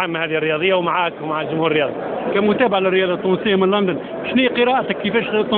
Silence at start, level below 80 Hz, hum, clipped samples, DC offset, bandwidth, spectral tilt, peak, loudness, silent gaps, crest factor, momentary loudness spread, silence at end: 0 s; -56 dBFS; none; under 0.1%; under 0.1%; 4.4 kHz; -10.5 dB/octave; -2 dBFS; -18 LUFS; none; 16 dB; 6 LU; 0 s